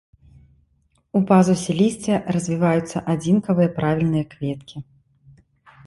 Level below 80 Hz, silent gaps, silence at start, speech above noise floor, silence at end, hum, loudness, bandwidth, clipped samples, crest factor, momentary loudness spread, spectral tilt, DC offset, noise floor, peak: -52 dBFS; none; 1.15 s; 45 dB; 1.05 s; none; -20 LUFS; 11.5 kHz; under 0.1%; 18 dB; 13 LU; -7 dB/octave; under 0.1%; -64 dBFS; -2 dBFS